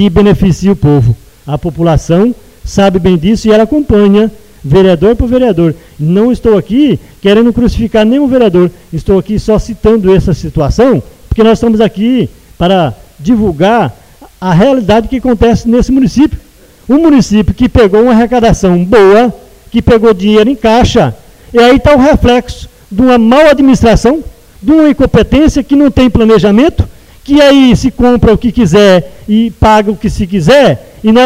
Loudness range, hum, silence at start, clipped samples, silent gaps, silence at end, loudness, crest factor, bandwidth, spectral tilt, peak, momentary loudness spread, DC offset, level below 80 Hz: 3 LU; none; 0 s; 0.5%; none; 0 s; -7 LUFS; 6 dB; 15.5 kHz; -7 dB/octave; 0 dBFS; 8 LU; under 0.1%; -22 dBFS